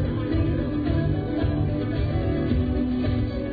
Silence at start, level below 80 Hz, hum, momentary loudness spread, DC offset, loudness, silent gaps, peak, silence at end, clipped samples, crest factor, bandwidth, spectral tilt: 0 s; -32 dBFS; none; 2 LU; under 0.1%; -25 LUFS; none; -10 dBFS; 0 s; under 0.1%; 12 dB; 4.9 kHz; -11 dB/octave